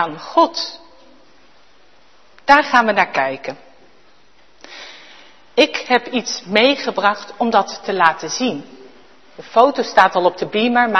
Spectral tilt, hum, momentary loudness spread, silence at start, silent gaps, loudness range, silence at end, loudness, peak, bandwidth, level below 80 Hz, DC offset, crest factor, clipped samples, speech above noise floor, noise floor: -3 dB/octave; none; 17 LU; 0 s; none; 4 LU; 0 s; -16 LUFS; 0 dBFS; 12 kHz; -58 dBFS; 0.5%; 18 dB; under 0.1%; 37 dB; -53 dBFS